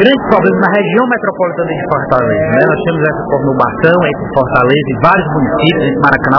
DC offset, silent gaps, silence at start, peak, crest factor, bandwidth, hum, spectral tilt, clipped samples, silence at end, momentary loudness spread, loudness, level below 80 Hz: under 0.1%; none; 0 s; 0 dBFS; 10 dB; 5.4 kHz; none; -9 dB/octave; 0.6%; 0 s; 5 LU; -11 LUFS; -36 dBFS